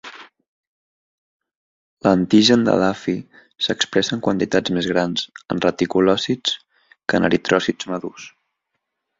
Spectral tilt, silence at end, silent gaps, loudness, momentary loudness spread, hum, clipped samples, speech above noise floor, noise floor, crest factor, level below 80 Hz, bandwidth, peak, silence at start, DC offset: -4.5 dB/octave; 0.9 s; 0.48-1.40 s, 1.55-1.97 s; -19 LUFS; 14 LU; none; under 0.1%; 58 dB; -77 dBFS; 20 dB; -54 dBFS; 7.8 kHz; -2 dBFS; 0.05 s; under 0.1%